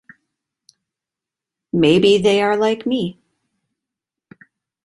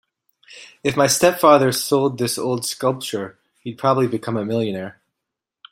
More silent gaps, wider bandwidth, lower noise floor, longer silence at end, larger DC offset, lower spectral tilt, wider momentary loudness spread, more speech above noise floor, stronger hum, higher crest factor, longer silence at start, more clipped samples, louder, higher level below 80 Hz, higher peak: neither; second, 11.5 kHz vs 16.5 kHz; first, -87 dBFS vs -83 dBFS; first, 1.7 s vs 0.8 s; neither; first, -5.5 dB/octave vs -4 dB/octave; second, 11 LU vs 16 LU; first, 71 dB vs 64 dB; neither; about the same, 18 dB vs 20 dB; first, 1.75 s vs 0.5 s; neither; first, -16 LUFS vs -19 LUFS; about the same, -58 dBFS vs -60 dBFS; about the same, -2 dBFS vs 0 dBFS